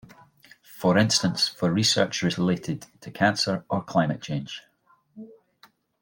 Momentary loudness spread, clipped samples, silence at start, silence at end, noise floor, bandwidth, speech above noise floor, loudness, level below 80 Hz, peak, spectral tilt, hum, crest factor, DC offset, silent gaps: 13 LU; under 0.1%; 0.7 s; 0.75 s; -59 dBFS; 17 kHz; 35 dB; -24 LUFS; -62 dBFS; -6 dBFS; -4 dB/octave; none; 20 dB; under 0.1%; none